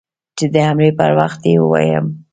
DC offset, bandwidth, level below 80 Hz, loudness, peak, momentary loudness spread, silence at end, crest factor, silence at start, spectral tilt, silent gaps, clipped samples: under 0.1%; 9 kHz; -52 dBFS; -14 LUFS; 0 dBFS; 7 LU; 0.1 s; 14 dB; 0.35 s; -7 dB/octave; none; under 0.1%